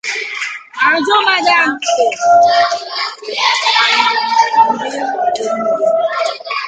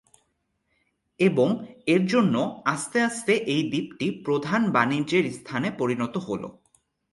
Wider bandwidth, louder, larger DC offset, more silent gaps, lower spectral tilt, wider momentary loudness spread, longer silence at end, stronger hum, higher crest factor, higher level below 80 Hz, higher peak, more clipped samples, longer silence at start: second, 9.2 kHz vs 11.5 kHz; first, -13 LUFS vs -25 LUFS; neither; neither; second, -1 dB/octave vs -5.5 dB/octave; about the same, 9 LU vs 8 LU; second, 0 s vs 0.6 s; neither; second, 14 dB vs 20 dB; about the same, -62 dBFS vs -66 dBFS; first, 0 dBFS vs -6 dBFS; neither; second, 0.05 s vs 1.2 s